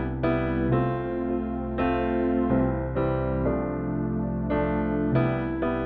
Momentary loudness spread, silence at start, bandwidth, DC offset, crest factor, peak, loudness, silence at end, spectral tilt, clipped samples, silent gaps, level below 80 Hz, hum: 4 LU; 0 s; 4.7 kHz; under 0.1%; 14 dB; -12 dBFS; -26 LUFS; 0 s; -11.5 dB/octave; under 0.1%; none; -38 dBFS; none